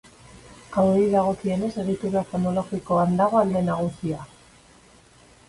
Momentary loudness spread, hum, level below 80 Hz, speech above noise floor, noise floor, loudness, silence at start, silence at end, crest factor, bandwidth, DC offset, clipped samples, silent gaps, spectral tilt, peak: 9 LU; none; -54 dBFS; 31 dB; -53 dBFS; -23 LUFS; 0.45 s; 1.2 s; 18 dB; 11.5 kHz; under 0.1%; under 0.1%; none; -8 dB/octave; -6 dBFS